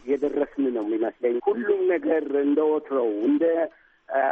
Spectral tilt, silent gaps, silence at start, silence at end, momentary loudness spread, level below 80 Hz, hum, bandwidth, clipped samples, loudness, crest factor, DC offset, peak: -7.5 dB/octave; none; 0.05 s; 0 s; 4 LU; -66 dBFS; none; 3.7 kHz; under 0.1%; -24 LUFS; 14 dB; under 0.1%; -10 dBFS